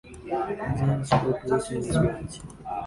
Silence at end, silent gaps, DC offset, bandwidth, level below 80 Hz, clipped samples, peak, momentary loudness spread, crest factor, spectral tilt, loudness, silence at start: 0 s; none; under 0.1%; 11.5 kHz; -44 dBFS; under 0.1%; -6 dBFS; 12 LU; 20 dB; -6.5 dB/octave; -27 LUFS; 0.05 s